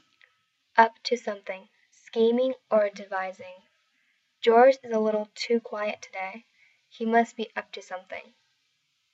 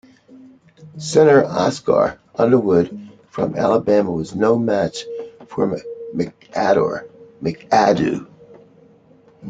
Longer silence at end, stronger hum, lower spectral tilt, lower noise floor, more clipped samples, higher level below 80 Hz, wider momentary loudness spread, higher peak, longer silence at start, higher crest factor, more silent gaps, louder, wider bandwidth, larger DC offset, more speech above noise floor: first, 0.9 s vs 0 s; neither; second, -4.5 dB/octave vs -6 dB/octave; first, -73 dBFS vs -51 dBFS; neither; second, under -90 dBFS vs -56 dBFS; first, 18 LU vs 15 LU; about the same, -4 dBFS vs -2 dBFS; about the same, 0.75 s vs 0.8 s; first, 24 dB vs 18 dB; neither; second, -26 LUFS vs -18 LUFS; second, 8 kHz vs 9.2 kHz; neither; first, 48 dB vs 34 dB